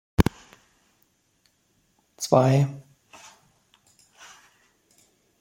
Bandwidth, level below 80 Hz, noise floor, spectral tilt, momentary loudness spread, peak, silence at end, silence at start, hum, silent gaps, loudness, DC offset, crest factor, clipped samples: 16.5 kHz; -44 dBFS; -68 dBFS; -6.5 dB/octave; 29 LU; -2 dBFS; 2.6 s; 0.2 s; none; none; -23 LUFS; under 0.1%; 26 dB; under 0.1%